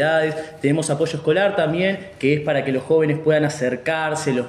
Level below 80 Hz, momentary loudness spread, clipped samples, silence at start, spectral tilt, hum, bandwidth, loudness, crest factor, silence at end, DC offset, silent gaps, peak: -60 dBFS; 5 LU; under 0.1%; 0 s; -5.5 dB/octave; none; 13 kHz; -20 LUFS; 14 dB; 0 s; under 0.1%; none; -4 dBFS